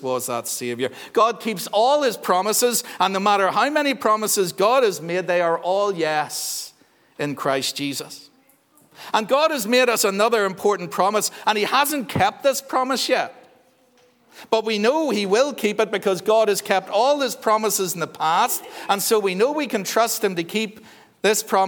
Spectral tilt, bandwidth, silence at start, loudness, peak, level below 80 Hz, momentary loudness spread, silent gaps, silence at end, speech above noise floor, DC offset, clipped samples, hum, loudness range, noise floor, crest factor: -3 dB/octave; over 20 kHz; 0 s; -21 LUFS; -2 dBFS; -70 dBFS; 7 LU; none; 0 s; 37 dB; under 0.1%; under 0.1%; none; 4 LU; -58 dBFS; 18 dB